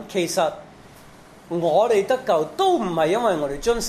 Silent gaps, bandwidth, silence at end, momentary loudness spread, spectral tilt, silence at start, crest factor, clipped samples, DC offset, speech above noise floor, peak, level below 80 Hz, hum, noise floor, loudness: none; 14 kHz; 0 s; 6 LU; -4.5 dB/octave; 0 s; 16 dB; under 0.1%; under 0.1%; 25 dB; -6 dBFS; -46 dBFS; none; -46 dBFS; -21 LUFS